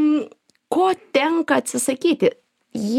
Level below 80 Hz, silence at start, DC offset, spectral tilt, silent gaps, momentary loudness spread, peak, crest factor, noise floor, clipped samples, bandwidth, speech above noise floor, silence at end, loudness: -68 dBFS; 0 s; under 0.1%; -4 dB/octave; none; 8 LU; -4 dBFS; 16 dB; -38 dBFS; under 0.1%; 16 kHz; 19 dB; 0 s; -20 LUFS